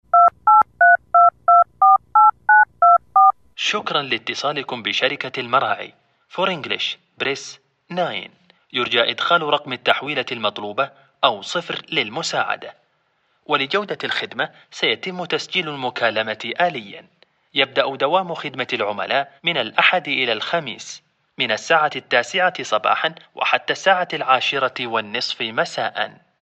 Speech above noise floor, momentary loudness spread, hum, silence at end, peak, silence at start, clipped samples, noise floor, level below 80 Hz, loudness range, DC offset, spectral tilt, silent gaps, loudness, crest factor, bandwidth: 44 dB; 12 LU; none; 0.3 s; 0 dBFS; 0.15 s; under 0.1%; -65 dBFS; -68 dBFS; 9 LU; under 0.1%; -3 dB/octave; none; -19 LUFS; 20 dB; 8.4 kHz